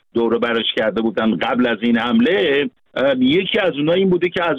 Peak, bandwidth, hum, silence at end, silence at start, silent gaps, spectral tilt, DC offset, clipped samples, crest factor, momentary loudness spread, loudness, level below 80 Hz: -6 dBFS; 6 kHz; none; 0 s; 0.15 s; none; -7 dB/octave; under 0.1%; under 0.1%; 10 dB; 4 LU; -17 LUFS; -54 dBFS